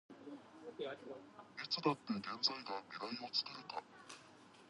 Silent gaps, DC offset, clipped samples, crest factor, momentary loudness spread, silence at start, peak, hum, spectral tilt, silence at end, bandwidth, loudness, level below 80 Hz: none; under 0.1%; under 0.1%; 24 dB; 18 LU; 0.1 s; -22 dBFS; none; -4 dB/octave; 0 s; 11 kHz; -42 LUFS; -86 dBFS